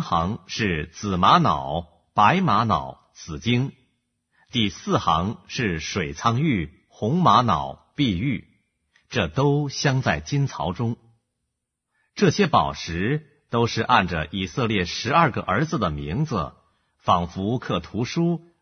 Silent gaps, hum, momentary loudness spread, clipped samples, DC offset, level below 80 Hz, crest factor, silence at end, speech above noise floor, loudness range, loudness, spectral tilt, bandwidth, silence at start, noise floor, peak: none; none; 11 LU; under 0.1%; under 0.1%; -46 dBFS; 20 dB; 0.2 s; 58 dB; 4 LU; -23 LUFS; -5.5 dB/octave; 6.6 kHz; 0 s; -80 dBFS; -2 dBFS